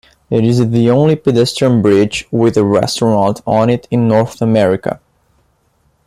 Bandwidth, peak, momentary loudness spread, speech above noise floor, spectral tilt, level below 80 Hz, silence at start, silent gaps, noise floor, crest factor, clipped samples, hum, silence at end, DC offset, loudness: 13.5 kHz; -2 dBFS; 4 LU; 46 dB; -6.5 dB/octave; -46 dBFS; 0.3 s; none; -58 dBFS; 12 dB; under 0.1%; none; 1.1 s; under 0.1%; -13 LUFS